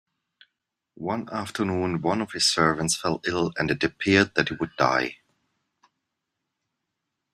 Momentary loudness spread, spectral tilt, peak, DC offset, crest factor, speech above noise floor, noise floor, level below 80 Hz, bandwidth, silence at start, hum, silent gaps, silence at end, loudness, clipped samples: 10 LU; -4 dB/octave; -4 dBFS; under 0.1%; 22 dB; 57 dB; -82 dBFS; -58 dBFS; 14.5 kHz; 1 s; none; none; 2.2 s; -24 LUFS; under 0.1%